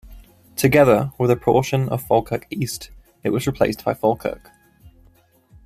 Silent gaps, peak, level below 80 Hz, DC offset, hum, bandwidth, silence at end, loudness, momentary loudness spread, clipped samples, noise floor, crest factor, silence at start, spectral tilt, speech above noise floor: none; -2 dBFS; -46 dBFS; under 0.1%; none; 15.5 kHz; 0.8 s; -20 LUFS; 14 LU; under 0.1%; -55 dBFS; 18 dB; 0.05 s; -6 dB/octave; 36 dB